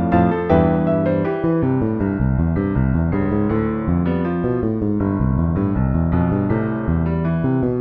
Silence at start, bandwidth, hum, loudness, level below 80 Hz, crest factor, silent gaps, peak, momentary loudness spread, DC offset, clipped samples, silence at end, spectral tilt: 0 s; 4.3 kHz; none; -19 LUFS; -30 dBFS; 16 dB; none; -2 dBFS; 4 LU; under 0.1%; under 0.1%; 0 s; -12 dB/octave